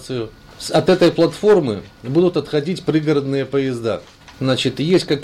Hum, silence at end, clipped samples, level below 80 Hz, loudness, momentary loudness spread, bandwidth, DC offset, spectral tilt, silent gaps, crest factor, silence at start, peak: none; 0 s; under 0.1%; -50 dBFS; -18 LUFS; 13 LU; 14 kHz; under 0.1%; -6 dB/octave; none; 12 dB; 0 s; -6 dBFS